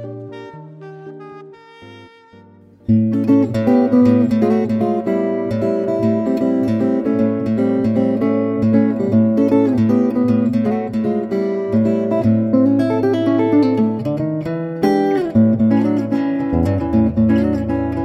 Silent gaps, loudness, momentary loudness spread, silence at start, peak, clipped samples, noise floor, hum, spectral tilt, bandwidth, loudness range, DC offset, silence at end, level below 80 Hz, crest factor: none; -16 LUFS; 7 LU; 0 s; -2 dBFS; under 0.1%; -45 dBFS; none; -9.5 dB/octave; 6.2 kHz; 2 LU; under 0.1%; 0 s; -42 dBFS; 14 dB